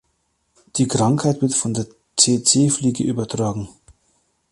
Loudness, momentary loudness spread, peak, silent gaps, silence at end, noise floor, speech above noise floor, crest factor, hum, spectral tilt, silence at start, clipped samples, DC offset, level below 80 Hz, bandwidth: -19 LUFS; 12 LU; 0 dBFS; none; 0.8 s; -68 dBFS; 50 dB; 20 dB; none; -4.5 dB/octave; 0.75 s; under 0.1%; under 0.1%; -52 dBFS; 11.5 kHz